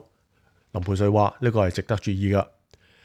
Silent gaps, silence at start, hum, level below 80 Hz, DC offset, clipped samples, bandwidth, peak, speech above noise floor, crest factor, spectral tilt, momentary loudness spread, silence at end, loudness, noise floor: none; 0.75 s; none; -50 dBFS; under 0.1%; under 0.1%; 10 kHz; -6 dBFS; 42 dB; 18 dB; -7.5 dB/octave; 11 LU; 0.6 s; -24 LUFS; -64 dBFS